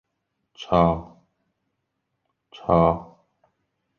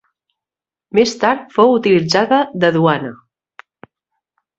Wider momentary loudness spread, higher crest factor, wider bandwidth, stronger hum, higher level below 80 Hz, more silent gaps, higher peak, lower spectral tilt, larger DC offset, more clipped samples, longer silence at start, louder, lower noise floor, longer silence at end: first, 14 LU vs 6 LU; first, 22 dB vs 16 dB; second, 6.8 kHz vs 8 kHz; neither; first, -44 dBFS vs -58 dBFS; neither; second, -4 dBFS vs 0 dBFS; first, -8.5 dB/octave vs -5.5 dB/octave; neither; neither; second, 0.6 s vs 0.95 s; second, -22 LUFS vs -14 LUFS; second, -78 dBFS vs -89 dBFS; second, 0.95 s vs 1.45 s